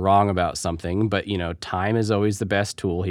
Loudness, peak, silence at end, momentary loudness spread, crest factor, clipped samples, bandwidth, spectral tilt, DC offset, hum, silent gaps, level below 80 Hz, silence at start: -23 LUFS; -6 dBFS; 0 s; 8 LU; 18 dB; under 0.1%; 14 kHz; -5.5 dB/octave; under 0.1%; none; none; -46 dBFS; 0 s